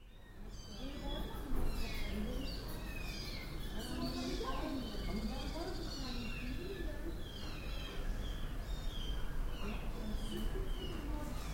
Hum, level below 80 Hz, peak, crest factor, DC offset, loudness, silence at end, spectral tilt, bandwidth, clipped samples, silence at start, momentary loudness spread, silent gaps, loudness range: none; -42 dBFS; -24 dBFS; 16 dB; under 0.1%; -44 LUFS; 0 s; -5 dB/octave; 16.5 kHz; under 0.1%; 0 s; 5 LU; none; 3 LU